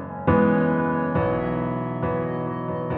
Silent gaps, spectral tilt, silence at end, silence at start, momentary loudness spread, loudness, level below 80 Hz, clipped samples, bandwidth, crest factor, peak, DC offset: none; -12 dB/octave; 0 s; 0 s; 8 LU; -23 LUFS; -46 dBFS; under 0.1%; 4.1 kHz; 18 dB; -6 dBFS; under 0.1%